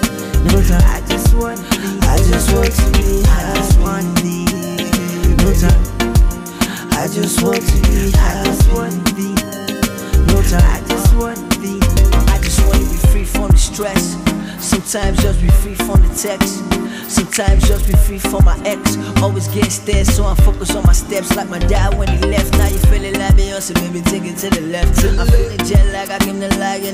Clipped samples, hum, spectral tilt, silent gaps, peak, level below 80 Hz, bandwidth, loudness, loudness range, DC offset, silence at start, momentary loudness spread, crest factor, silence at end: under 0.1%; none; -5 dB/octave; none; 0 dBFS; -14 dBFS; 16 kHz; -15 LUFS; 1 LU; under 0.1%; 0 s; 5 LU; 12 dB; 0 s